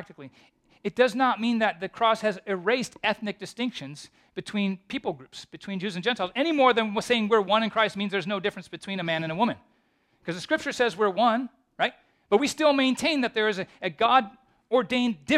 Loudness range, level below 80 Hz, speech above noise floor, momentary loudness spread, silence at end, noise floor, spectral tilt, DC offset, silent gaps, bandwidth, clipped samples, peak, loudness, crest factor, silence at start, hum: 6 LU; -66 dBFS; 42 dB; 14 LU; 0 s; -68 dBFS; -4.5 dB/octave; under 0.1%; none; 14 kHz; under 0.1%; -6 dBFS; -26 LUFS; 20 dB; 0 s; none